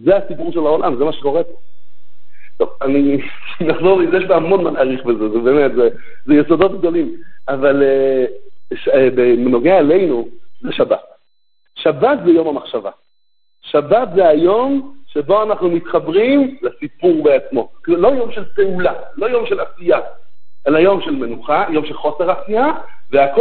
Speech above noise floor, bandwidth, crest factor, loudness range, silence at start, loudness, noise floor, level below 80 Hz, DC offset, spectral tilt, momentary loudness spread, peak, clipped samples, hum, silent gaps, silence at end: 56 dB; 4.5 kHz; 14 dB; 4 LU; 0 s; -15 LUFS; -70 dBFS; -50 dBFS; 5%; -11 dB/octave; 10 LU; 0 dBFS; under 0.1%; none; none; 0 s